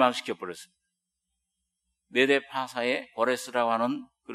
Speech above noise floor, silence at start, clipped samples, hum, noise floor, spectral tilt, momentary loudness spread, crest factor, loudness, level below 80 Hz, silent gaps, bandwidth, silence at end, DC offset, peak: 56 dB; 0 s; under 0.1%; none; -83 dBFS; -3.5 dB/octave; 13 LU; 24 dB; -28 LUFS; -80 dBFS; none; 13 kHz; 0 s; under 0.1%; -6 dBFS